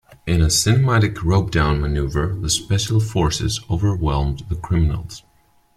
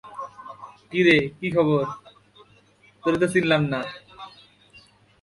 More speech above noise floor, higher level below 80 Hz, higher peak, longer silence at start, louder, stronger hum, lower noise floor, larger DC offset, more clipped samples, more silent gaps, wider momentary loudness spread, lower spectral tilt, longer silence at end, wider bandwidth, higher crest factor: about the same, 39 dB vs 36 dB; first, -30 dBFS vs -60 dBFS; first, -2 dBFS vs -6 dBFS; first, 0.25 s vs 0.05 s; first, -19 LUFS vs -22 LUFS; neither; about the same, -57 dBFS vs -57 dBFS; neither; neither; neither; second, 7 LU vs 24 LU; about the same, -5 dB/octave vs -6 dB/octave; second, 0.6 s vs 0.95 s; first, 15 kHz vs 11.5 kHz; about the same, 16 dB vs 20 dB